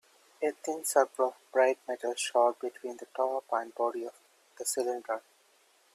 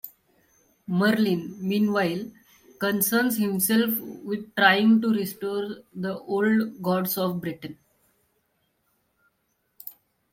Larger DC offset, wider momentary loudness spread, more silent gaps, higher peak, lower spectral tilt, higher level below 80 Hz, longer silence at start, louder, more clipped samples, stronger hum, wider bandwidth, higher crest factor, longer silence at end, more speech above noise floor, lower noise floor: neither; second, 11 LU vs 20 LU; neither; second, -12 dBFS vs -4 dBFS; second, -1 dB/octave vs -4.5 dB/octave; second, -86 dBFS vs -68 dBFS; first, 0.4 s vs 0.05 s; second, -31 LUFS vs -24 LUFS; neither; neither; about the same, 15.5 kHz vs 16.5 kHz; about the same, 22 dB vs 22 dB; first, 0.75 s vs 0.4 s; second, 35 dB vs 49 dB; second, -66 dBFS vs -73 dBFS